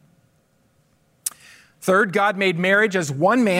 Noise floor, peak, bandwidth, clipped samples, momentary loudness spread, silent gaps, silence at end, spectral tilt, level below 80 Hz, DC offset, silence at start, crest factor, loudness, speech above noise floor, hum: -62 dBFS; -4 dBFS; 16 kHz; under 0.1%; 13 LU; none; 0 s; -4.5 dB/octave; -70 dBFS; under 0.1%; 1.25 s; 16 dB; -20 LUFS; 44 dB; none